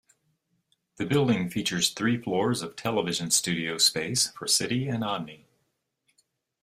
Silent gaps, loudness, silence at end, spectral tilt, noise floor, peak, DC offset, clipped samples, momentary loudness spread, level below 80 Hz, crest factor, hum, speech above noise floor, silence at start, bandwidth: none; -26 LUFS; 1.25 s; -3 dB/octave; -77 dBFS; -8 dBFS; under 0.1%; under 0.1%; 8 LU; -64 dBFS; 20 dB; none; 50 dB; 1 s; 15.5 kHz